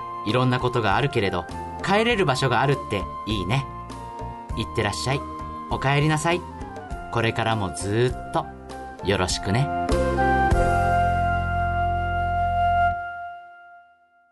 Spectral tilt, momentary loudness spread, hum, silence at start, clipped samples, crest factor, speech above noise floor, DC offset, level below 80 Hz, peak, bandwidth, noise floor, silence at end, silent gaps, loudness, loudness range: -5.5 dB/octave; 14 LU; none; 0 s; under 0.1%; 14 dB; 34 dB; under 0.1%; -36 dBFS; -10 dBFS; 11.5 kHz; -57 dBFS; 0.5 s; none; -23 LUFS; 4 LU